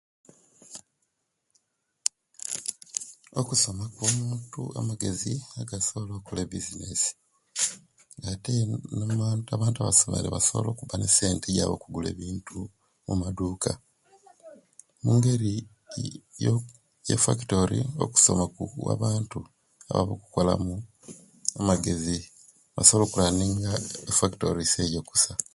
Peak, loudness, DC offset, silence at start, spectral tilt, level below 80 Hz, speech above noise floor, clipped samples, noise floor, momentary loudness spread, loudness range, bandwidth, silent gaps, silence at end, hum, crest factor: 0 dBFS; -26 LUFS; under 0.1%; 0.7 s; -4 dB/octave; -48 dBFS; 51 dB; under 0.1%; -78 dBFS; 16 LU; 7 LU; 11.5 kHz; none; 0.15 s; none; 28 dB